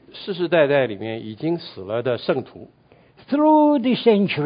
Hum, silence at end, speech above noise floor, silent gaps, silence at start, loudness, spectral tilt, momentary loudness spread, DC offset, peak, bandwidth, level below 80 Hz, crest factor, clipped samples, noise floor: none; 0 s; 32 dB; none; 0.15 s; -20 LUFS; -11.5 dB/octave; 13 LU; under 0.1%; -4 dBFS; 5.2 kHz; -62 dBFS; 16 dB; under 0.1%; -51 dBFS